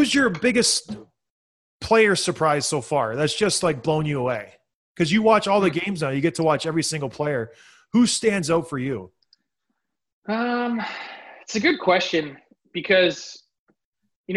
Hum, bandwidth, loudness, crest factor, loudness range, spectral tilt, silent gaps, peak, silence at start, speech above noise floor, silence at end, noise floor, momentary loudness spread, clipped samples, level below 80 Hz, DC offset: none; 12.5 kHz; -21 LUFS; 18 dB; 4 LU; -4 dB/octave; 1.30-1.80 s, 4.75-4.95 s, 10.13-10.22 s, 13.59-13.67 s, 13.85-13.93 s, 14.16-14.24 s; -4 dBFS; 0 s; 57 dB; 0 s; -78 dBFS; 16 LU; under 0.1%; -58 dBFS; under 0.1%